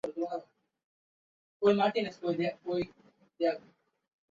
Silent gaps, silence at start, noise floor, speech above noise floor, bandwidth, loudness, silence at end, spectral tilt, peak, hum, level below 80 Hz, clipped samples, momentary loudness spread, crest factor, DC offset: 0.84-1.60 s; 0.05 s; under -90 dBFS; over 60 dB; 7.6 kHz; -32 LUFS; 0.75 s; -7 dB/octave; -12 dBFS; none; -72 dBFS; under 0.1%; 13 LU; 22 dB; under 0.1%